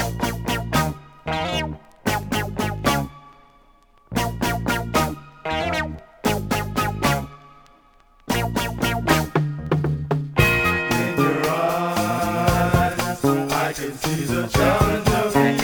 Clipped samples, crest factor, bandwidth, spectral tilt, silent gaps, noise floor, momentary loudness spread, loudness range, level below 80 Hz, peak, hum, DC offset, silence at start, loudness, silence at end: under 0.1%; 20 dB; over 20 kHz; -5 dB/octave; none; -54 dBFS; 8 LU; 5 LU; -38 dBFS; -2 dBFS; none; under 0.1%; 0 s; -22 LUFS; 0 s